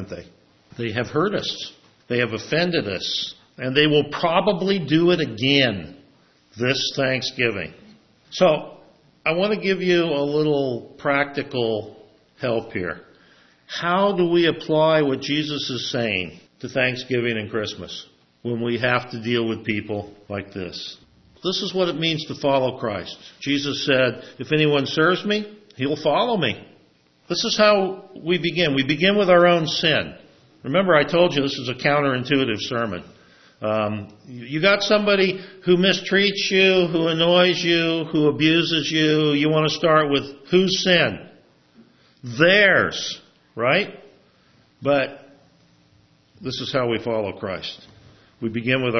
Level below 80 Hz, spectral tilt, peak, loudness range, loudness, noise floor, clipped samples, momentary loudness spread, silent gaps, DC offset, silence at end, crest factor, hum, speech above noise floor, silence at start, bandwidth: -60 dBFS; -5 dB/octave; 0 dBFS; 8 LU; -20 LUFS; -58 dBFS; under 0.1%; 14 LU; none; under 0.1%; 0 s; 22 dB; none; 37 dB; 0 s; 6.4 kHz